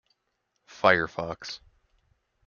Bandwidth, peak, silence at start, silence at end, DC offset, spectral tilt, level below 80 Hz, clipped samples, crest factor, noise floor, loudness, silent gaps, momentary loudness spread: 7.2 kHz; -4 dBFS; 0.75 s; 0.9 s; under 0.1%; -4.5 dB/octave; -62 dBFS; under 0.1%; 26 dB; -78 dBFS; -25 LUFS; none; 17 LU